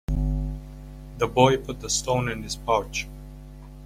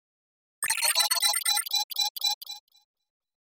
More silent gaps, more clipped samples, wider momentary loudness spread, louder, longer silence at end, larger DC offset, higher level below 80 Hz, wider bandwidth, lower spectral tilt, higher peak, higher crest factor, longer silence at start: second, none vs 1.84-1.90 s, 2.10-2.15 s, 2.34-2.41 s; neither; first, 23 LU vs 12 LU; about the same, -25 LUFS vs -25 LUFS; second, 0 s vs 0.95 s; neither; first, -34 dBFS vs -78 dBFS; about the same, 16 kHz vs 17 kHz; first, -4.5 dB/octave vs 5 dB/octave; first, -4 dBFS vs -10 dBFS; about the same, 22 dB vs 20 dB; second, 0.1 s vs 0.6 s